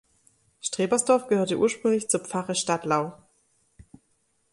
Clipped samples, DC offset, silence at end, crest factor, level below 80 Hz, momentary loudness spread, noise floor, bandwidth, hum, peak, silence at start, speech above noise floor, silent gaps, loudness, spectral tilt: under 0.1%; under 0.1%; 1.4 s; 20 dB; -66 dBFS; 7 LU; -70 dBFS; 11.5 kHz; none; -8 dBFS; 0.65 s; 46 dB; none; -25 LUFS; -4 dB/octave